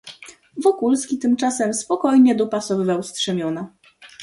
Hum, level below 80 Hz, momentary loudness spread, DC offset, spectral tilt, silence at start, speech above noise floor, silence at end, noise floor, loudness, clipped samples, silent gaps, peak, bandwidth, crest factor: none; -64 dBFS; 14 LU; under 0.1%; -4.5 dB/octave; 0.05 s; 23 dB; 0 s; -42 dBFS; -19 LUFS; under 0.1%; none; -4 dBFS; 11.5 kHz; 16 dB